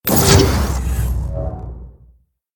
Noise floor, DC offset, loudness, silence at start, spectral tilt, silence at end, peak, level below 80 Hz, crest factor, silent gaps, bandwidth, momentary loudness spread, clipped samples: -53 dBFS; under 0.1%; -16 LUFS; 0.05 s; -4.5 dB/octave; 0.65 s; 0 dBFS; -22 dBFS; 18 dB; none; 19.5 kHz; 21 LU; under 0.1%